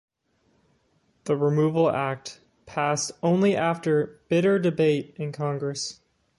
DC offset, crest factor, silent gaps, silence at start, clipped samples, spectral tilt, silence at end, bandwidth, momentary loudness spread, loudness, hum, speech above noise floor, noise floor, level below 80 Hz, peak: under 0.1%; 16 dB; none; 1.25 s; under 0.1%; -5.5 dB/octave; 0.45 s; 11.5 kHz; 12 LU; -25 LUFS; none; 44 dB; -68 dBFS; -66 dBFS; -10 dBFS